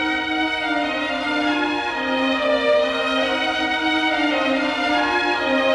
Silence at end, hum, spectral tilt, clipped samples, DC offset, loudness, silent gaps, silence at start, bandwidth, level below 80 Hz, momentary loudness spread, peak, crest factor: 0 s; none; -3.5 dB/octave; under 0.1%; under 0.1%; -20 LUFS; none; 0 s; 11.5 kHz; -52 dBFS; 3 LU; -8 dBFS; 12 dB